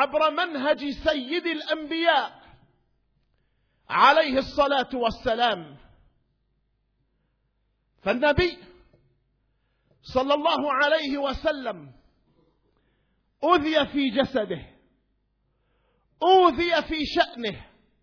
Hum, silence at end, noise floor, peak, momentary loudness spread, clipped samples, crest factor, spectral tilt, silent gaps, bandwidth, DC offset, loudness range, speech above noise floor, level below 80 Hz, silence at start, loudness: none; 0.4 s; -72 dBFS; -6 dBFS; 14 LU; under 0.1%; 20 dB; -5.5 dB/octave; none; 5.4 kHz; under 0.1%; 6 LU; 48 dB; -50 dBFS; 0 s; -23 LUFS